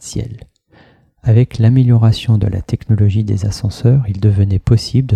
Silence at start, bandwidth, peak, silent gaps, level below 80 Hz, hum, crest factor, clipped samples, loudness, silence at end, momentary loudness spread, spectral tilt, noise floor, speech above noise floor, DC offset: 0 s; 9.8 kHz; 0 dBFS; none; -34 dBFS; none; 14 dB; under 0.1%; -14 LUFS; 0 s; 10 LU; -7.5 dB/octave; -48 dBFS; 36 dB; under 0.1%